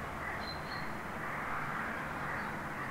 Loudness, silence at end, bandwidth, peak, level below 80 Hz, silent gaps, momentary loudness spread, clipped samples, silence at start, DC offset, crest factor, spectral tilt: -39 LUFS; 0 s; 16 kHz; -26 dBFS; -56 dBFS; none; 3 LU; under 0.1%; 0 s; under 0.1%; 14 dB; -5 dB/octave